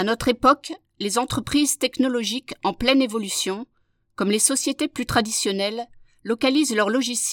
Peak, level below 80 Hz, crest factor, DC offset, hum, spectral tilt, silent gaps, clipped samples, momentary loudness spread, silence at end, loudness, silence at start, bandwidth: -4 dBFS; -48 dBFS; 20 dB; under 0.1%; none; -2.5 dB/octave; none; under 0.1%; 9 LU; 0 s; -22 LUFS; 0 s; 18 kHz